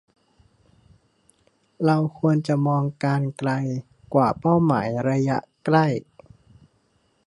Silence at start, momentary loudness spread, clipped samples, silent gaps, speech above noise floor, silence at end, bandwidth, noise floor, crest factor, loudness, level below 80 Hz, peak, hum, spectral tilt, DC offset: 1.8 s; 6 LU; under 0.1%; none; 45 dB; 1.25 s; 10.5 kHz; -66 dBFS; 20 dB; -22 LUFS; -60 dBFS; -4 dBFS; none; -8.5 dB/octave; under 0.1%